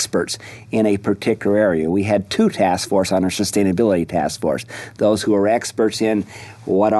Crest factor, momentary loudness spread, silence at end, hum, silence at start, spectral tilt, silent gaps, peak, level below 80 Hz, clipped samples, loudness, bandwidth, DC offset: 14 dB; 7 LU; 0 s; none; 0 s; -5 dB/octave; none; -4 dBFS; -52 dBFS; under 0.1%; -19 LUFS; 12.5 kHz; under 0.1%